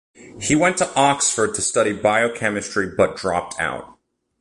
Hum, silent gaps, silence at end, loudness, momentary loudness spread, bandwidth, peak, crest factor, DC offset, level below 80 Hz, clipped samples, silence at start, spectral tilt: none; none; 0.5 s; -19 LUFS; 8 LU; 11.5 kHz; -4 dBFS; 18 dB; under 0.1%; -50 dBFS; under 0.1%; 0.2 s; -3 dB/octave